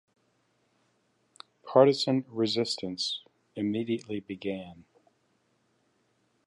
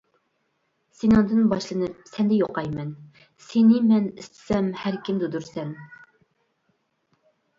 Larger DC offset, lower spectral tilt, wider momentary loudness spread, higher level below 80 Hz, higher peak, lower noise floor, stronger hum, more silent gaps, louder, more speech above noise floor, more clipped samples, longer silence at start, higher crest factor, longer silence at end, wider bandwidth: neither; second, -5.5 dB/octave vs -7.5 dB/octave; about the same, 17 LU vs 15 LU; second, -72 dBFS vs -54 dBFS; about the same, -6 dBFS vs -6 dBFS; about the same, -72 dBFS vs -72 dBFS; neither; neither; second, -29 LUFS vs -23 LUFS; second, 44 dB vs 50 dB; neither; first, 1.65 s vs 1.05 s; first, 24 dB vs 18 dB; about the same, 1.65 s vs 1.65 s; first, 11.5 kHz vs 7.6 kHz